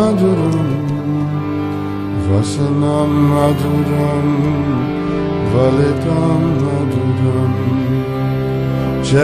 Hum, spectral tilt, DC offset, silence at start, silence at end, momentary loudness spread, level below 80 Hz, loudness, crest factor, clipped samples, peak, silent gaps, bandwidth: none; -8 dB/octave; 0.1%; 0 s; 0 s; 5 LU; -38 dBFS; -16 LUFS; 14 dB; under 0.1%; 0 dBFS; none; 14.5 kHz